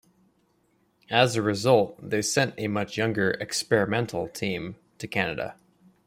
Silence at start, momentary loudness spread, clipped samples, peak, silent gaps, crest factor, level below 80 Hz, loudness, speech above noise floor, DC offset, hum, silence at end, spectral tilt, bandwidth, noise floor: 1.1 s; 11 LU; under 0.1%; -6 dBFS; none; 22 dB; -62 dBFS; -26 LUFS; 42 dB; under 0.1%; none; 0.55 s; -4.5 dB/octave; 16 kHz; -68 dBFS